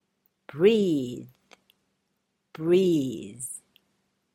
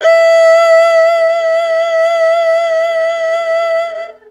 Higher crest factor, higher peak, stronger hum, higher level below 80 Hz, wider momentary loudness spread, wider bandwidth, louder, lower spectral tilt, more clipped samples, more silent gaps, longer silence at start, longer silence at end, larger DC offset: first, 20 dB vs 10 dB; second, -8 dBFS vs 0 dBFS; neither; second, -70 dBFS vs -64 dBFS; first, 19 LU vs 8 LU; first, 16 kHz vs 11.5 kHz; second, -25 LUFS vs -11 LUFS; first, -6 dB/octave vs 1 dB/octave; neither; neither; first, 0.55 s vs 0 s; first, 0.75 s vs 0.2 s; neither